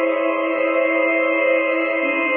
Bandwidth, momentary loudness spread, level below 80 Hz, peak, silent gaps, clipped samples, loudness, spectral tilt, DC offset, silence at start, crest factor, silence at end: 3.5 kHz; 3 LU; under -90 dBFS; -6 dBFS; none; under 0.1%; -18 LUFS; -7.5 dB/octave; under 0.1%; 0 s; 12 dB; 0 s